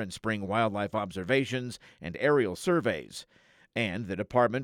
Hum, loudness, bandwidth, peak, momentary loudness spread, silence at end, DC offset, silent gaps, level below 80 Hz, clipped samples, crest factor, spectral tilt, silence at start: none; -29 LUFS; 16.5 kHz; -12 dBFS; 15 LU; 0 s; under 0.1%; none; -64 dBFS; under 0.1%; 18 dB; -5.5 dB/octave; 0 s